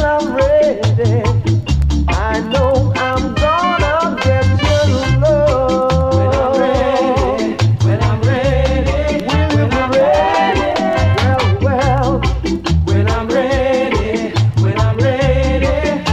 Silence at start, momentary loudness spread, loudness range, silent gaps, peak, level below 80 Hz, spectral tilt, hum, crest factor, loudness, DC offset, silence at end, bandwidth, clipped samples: 0 s; 3 LU; 1 LU; none; 0 dBFS; -22 dBFS; -6.5 dB/octave; none; 12 dB; -14 LUFS; under 0.1%; 0 s; 9.4 kHz; under 0.1%